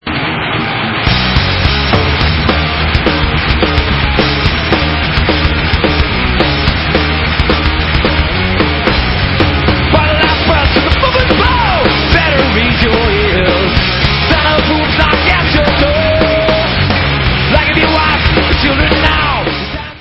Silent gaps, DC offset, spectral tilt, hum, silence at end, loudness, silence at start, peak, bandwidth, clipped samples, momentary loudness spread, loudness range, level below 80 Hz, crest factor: none; under 0.1%; -7.5 dB/octave; none; 0 s; -10 LUFS; 0.05 s; 0 dBFS; 8 kHz; 0.1%; 3 LU; 2 LU; -18 dBFS; 10 dB